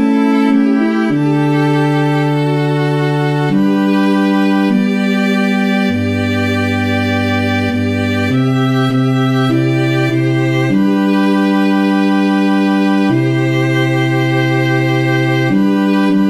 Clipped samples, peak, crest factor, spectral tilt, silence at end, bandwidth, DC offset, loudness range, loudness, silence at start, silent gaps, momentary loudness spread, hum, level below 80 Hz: under 0.1%; -2 dBFS; 12 dB; -7 dB/octave; 0 s; 15 kHz; 0.2%; 2 LU; -13 LUFS; 0 s; none; 2 LU; none; -58 dBFS